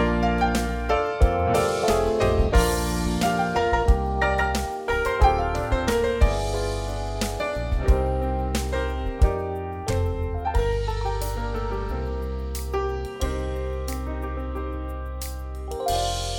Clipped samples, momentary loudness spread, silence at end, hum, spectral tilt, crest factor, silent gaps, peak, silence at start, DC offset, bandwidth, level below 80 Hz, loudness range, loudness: under 0.1%; 9 LU; 0 s; none; -5.5 dB/octave; 18 dB; none; -6 dBFS; 0 s; under 0.1%; 19 kHz; -28 dBFS; 7 LU; -25 LUFS